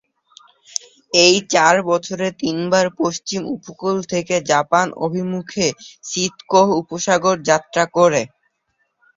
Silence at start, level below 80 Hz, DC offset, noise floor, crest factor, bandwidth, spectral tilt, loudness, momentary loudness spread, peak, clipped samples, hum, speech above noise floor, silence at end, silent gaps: 1.15 s; -60 dBFS; under 0.1%; -69 dBFS; 18 dB; 7.8 kHz; -3.5 dB/octave; -18 LUFS; 11 LU; 0 dBFS; under 0.1%; none; 51 dB; 0.9 s; none